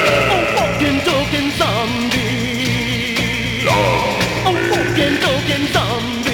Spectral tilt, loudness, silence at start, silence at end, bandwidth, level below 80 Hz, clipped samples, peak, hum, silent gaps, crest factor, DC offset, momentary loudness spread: -4.5 dB/octave; -16 LUFS; 0 s; 0 s; 19 kHz; -36 dBFS; under 0.1%; -2 dBFS; none; none; 14 dB; under 0.1%; 3 LU